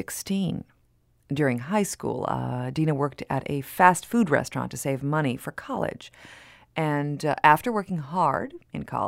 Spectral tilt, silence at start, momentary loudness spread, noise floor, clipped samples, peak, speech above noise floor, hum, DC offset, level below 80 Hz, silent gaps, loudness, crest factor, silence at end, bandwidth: -5.5 dB/octave; 0 s; 13 LU; -64 dBFS; under 0.1%; -2 dBFS; 39 dB; none; under 0.1%; -58 dBFS; none; -26 LUFS; 24 dB; 0 s; 16 kHz